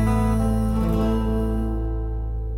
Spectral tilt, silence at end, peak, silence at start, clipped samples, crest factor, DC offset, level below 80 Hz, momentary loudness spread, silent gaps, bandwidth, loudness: -8 dB/octave; 0 s; -10 dBFS; 0 s; under 0.1%; 10 dB; under 0.1%; -26 dBFS; 7 LU; none; 13.5 kHz; -24 LUFS